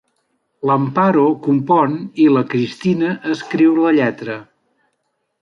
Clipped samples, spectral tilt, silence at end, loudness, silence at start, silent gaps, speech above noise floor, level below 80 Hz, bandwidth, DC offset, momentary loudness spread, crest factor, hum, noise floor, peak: under 0.1%; -8 dB/octave; 1 s; -16 LUFS; 0.65 s; none; 55 dB; -62 dBFS; 7.2 kHz; under 0.1%; 9 LU; 14 dB; none; -70 dBFS; -2 dBFS